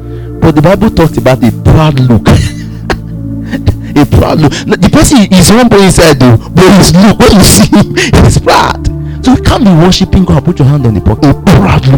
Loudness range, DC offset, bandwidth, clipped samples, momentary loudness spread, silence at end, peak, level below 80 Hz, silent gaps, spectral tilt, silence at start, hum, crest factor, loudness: 5 LU; 0.8%; over 20 kHz; 8%; 11 LU; 0 s; 0 dBFS; -18 dBFS; none; -5.5 dB/octave; 0 s; none; 4 dB; -5 LUFS